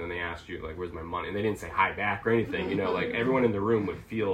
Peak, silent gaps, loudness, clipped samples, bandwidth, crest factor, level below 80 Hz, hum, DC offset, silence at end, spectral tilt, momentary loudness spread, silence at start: -12 dBFS; none; -29 LUFS; under 0.1%; 13.5 kHz; 18 dB; -54 dBFS; none; under 0.1%; 0 s; -7 dB/octave; 11 LU; 0 s